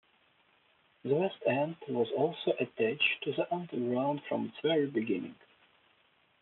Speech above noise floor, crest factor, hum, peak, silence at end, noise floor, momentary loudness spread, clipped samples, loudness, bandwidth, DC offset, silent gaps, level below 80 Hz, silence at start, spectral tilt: 37 dB; 18 dB; none; -16 dBFS; 1.1 s; -69 dBFS; 6 LU; under 0.1%; -32 LUFS; 4.3 kHz; under 0.1%; none; -82 dBFS; 1.05 s; -3.5 dB/octave